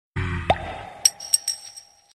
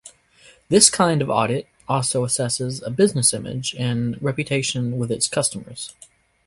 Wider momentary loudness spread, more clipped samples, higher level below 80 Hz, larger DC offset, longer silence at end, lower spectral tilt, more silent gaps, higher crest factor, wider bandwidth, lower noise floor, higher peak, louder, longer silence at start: about the same, 14 LU vs 13 LU; neither; first, -42 dBFS vs -56 dBFS; neither; second, 0.35 s vs 0.55 s; second, -2 dB/octave vs -3.5 dB/octave; neither; about the same, 24 dB vs 22 dB; first, 14 kHz vs 11.5 kHz; second, -45 dBFS vs -52 dBFS; about the same, -2 dBFS vs 0 dBFS; second, -23 LUFS vs -20 LUFS; about the same, 0.15 s vs 0.05 s